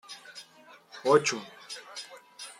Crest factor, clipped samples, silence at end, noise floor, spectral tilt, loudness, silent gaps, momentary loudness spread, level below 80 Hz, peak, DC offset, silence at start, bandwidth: 24 dB; under 0.1%; 0.1 s; -55 dBFS; -3 dB/octave; -28 LUFS; none; 23 LU; -80 dBFS; -8 dBFS; under 0.1%; 0.1 s; 14 kHz